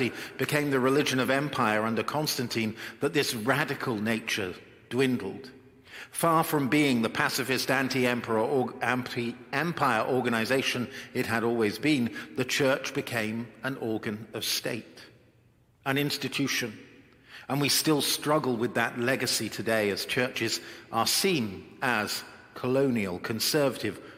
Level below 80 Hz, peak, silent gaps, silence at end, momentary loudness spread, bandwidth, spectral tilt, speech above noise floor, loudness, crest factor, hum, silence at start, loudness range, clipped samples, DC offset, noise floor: -68 dBFS; -8 dBFS; none; 0 s; 9 LU; 16.5 kHz; -4 dB/octave; 34 dB; -28 LUFS; 22 dB; none; 0 s; 5 LU; under 0.1%; under 0.1%; -63 dBFS